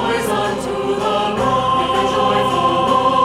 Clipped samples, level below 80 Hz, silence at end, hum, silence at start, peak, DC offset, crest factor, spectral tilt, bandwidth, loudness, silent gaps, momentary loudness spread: under 0.1%; -42 dBFS; 0 s; none; 0 s; -4 dBFS; under 0.1%; 14 dB; -4.5 dB/octave; 16 kHz; -17 LUFS; none; 5 LU